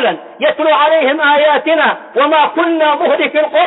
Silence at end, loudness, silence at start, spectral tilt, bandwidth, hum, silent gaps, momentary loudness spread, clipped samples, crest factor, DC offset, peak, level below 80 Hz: 0 s; -11 LUFS; 0 s; -8 dB/octave; 4.1 kHz; none; none; 4 LU; under 0.1%; 10 dB; under 0.1%; 0 dBFS; -68 dBFS